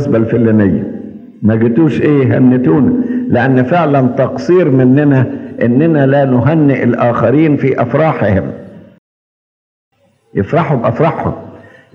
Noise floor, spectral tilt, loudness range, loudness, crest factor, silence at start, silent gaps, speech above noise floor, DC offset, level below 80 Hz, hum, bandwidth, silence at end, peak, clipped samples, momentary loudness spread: under -90 dBFS; -10 dB/octave; 6 LU; -11 LUFS; 12 dB; 0 s; 8.98-9.91 s; over 80 dB; under 0.1%; -52 dBFS; none; 6.8 kHz; 0.35 s; 0 dBFS; under 0.1%; 9 LU